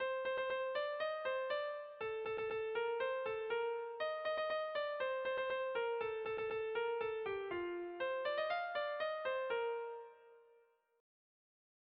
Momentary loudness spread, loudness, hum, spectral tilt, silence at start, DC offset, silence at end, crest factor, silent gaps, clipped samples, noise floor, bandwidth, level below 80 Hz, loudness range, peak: 4 LU; -40 LUFS; none; -0.5 dB/octave; 0 s; under 0.1%; 1.55 s; 12 dB; none; under 0.1%; -72 dBFS; 5.4 kHz; -78 dBFS; 2 LU; -28 dBFS